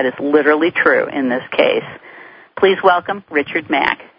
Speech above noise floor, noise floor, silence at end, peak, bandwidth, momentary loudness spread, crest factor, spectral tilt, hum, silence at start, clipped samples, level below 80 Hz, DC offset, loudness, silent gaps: 24 dB; -40 dBFS; 0.15 s; 0 dBFS; 5.2 kHz; 8 LU; 16 dB; -7.5 dB/octave; none; 0 s; under 0.1%; -58 dBFS; under 0.1%; -15 LUFS; none